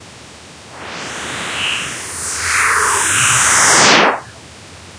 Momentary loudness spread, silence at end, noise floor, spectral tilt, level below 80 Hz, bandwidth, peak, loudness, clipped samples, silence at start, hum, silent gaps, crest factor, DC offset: 17 LU; 0 s; -37 dBFS; -0.5 dB/octave; -46 dBFS; 11 kHz; 0 dBFS; -12 LUFS; under 0.1%; 0 s; none; none; 16 dB; under 0.1%